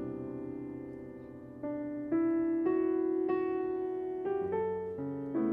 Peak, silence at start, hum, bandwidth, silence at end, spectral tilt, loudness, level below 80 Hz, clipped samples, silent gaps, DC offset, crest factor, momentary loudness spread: -18 dBFS; 0 s; none; 3.6 kHz; 0 s; -10.5 dB/octave; -34 LUFS; -68 dBFS; under 0.1%; none; under 0.1%; 14 dB; 13 LU